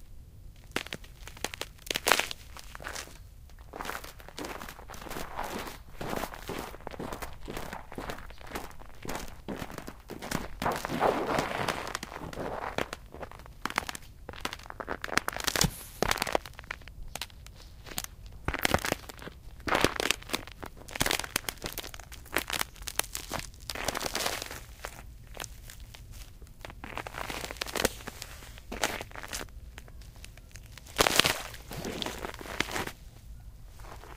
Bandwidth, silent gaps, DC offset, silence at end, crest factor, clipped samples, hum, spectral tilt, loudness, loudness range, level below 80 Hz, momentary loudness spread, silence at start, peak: 16 kHz; none; under 0.1%; 0 s; 36 dB; under 0.1%; none; -2.5 dB/octave; -34 LUFS; 9 LU; -48 dBFS; 20 LU; 0 s; 0 dBFS